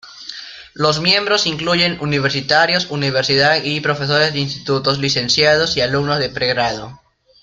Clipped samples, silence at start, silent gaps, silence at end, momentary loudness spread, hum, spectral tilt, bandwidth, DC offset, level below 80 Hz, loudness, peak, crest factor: under 0.1%; 0.05 s; none; 0.45 s; 10 LU; none; -4 dB/octave; 9 kHz; under 0.1%; -48 dBFS; -15 LUFS; 0 dBFS; 18 dB